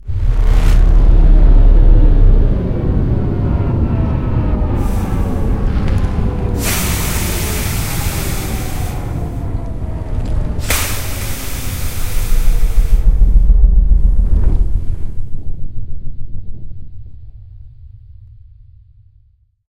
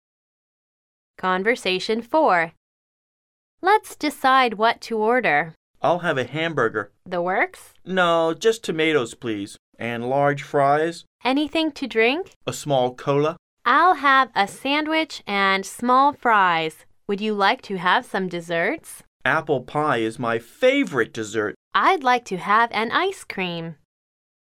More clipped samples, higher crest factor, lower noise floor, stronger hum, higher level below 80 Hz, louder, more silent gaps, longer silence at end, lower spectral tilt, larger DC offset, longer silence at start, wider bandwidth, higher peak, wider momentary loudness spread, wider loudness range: neither; second, 12 dB vs 18 dB; second, -52 dBFS vs under -90 dBFS; neither; first, -14 dBFS vs -64 dBFS; first, -17 LUFS vs -21 LUFS; second, none vs 2.57-3.58 s, 5.57-5.74 s, 9.59-9.72 s, 11.07-11.19 s, 12.36-12.41 s, 13.39-13.57 s, 19.07-19.20 s, 21.56-21.71 s; first, 1.75 s vs 0.7 s; about the same, -5.5 dB/octave vs -4.5 dB/octave; neither; second, 0 s vs 1.25 s; about the same, 16 kHz vs 15.5 kHz; first, 0 dBFS vs -4 dBFS; first, 17 LU vs 10 LU; first, 15 LU vs 3 LU